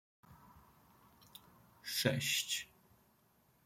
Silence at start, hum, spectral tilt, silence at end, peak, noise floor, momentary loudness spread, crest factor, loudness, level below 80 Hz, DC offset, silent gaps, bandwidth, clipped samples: 0.3 s; none; -2.5 dB/octave; 1 s; -18 dBFS; -72 dBFS; 24 LU; 26 dB; -36 LUFS; -76 dBFS; under 0.1%; none; 16.5 kHz; under 0.1%